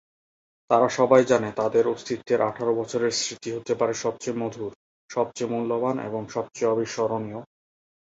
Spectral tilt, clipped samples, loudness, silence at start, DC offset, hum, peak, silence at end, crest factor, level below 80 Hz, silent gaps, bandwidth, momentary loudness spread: -4.5 dB/octave; under 0.1%; -25 LUFS; 0.7 s; under 0.1%; none; -4 dBFS; 0.75 s; 20 dB; -66 dBFS; 4.76-5.09 s; 8 kHz; 12 LU